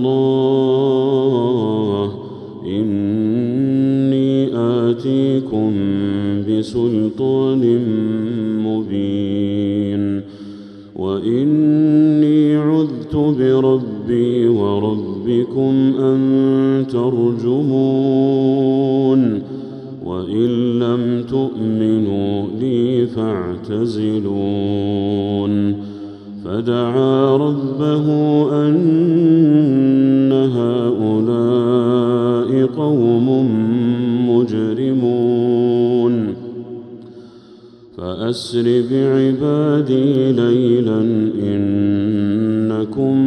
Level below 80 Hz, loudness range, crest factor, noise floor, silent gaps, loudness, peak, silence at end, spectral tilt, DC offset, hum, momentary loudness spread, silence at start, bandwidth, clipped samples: -56 dBFS; 5 LU; 12 dB; -41 dBFS; none; -16 LUFS; -2 dBFS; 0 s; -9 dB/octave; under 0.1%; none; 8 LU; 0 s; 9.2 kHz; under 0.1%